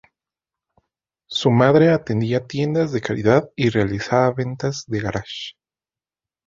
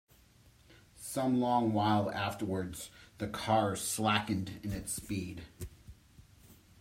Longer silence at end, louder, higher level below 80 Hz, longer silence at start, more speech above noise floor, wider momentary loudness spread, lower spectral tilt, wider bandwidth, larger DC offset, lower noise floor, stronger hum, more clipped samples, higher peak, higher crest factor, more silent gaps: first, 1 s vs 0.3 s; first, -19 LUFS vs -33 LUFS; first, -50 dBFS vs -58 dBFS; first, 1.3 s vs 0.7 s; first, over 71 dB vs 29 dB; second, 12 LU vs 17 LU; first, -6.5 dB/octave vs -4.5 dB/octave; second, 7.6 kHz vs 16 kHz; neither; first, under -90 dBFS vs -62 dBFS; neither; neither; first, -2 dBFS vs -14 dBFS; about the same, 18 dB vs 22 dB; neither